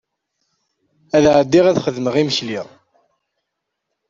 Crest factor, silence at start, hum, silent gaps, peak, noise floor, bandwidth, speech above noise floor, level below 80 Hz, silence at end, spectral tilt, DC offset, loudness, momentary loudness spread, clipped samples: 18 dB; 1.15 s; none; none; -2 dBFS; -77 dBFS; 7.6 kHz; 62 dB; -52 dBFS; 1.45 s; -5.5 dB/octave; under 0.1%; -16 LUFS; 15 LU; under 0.1%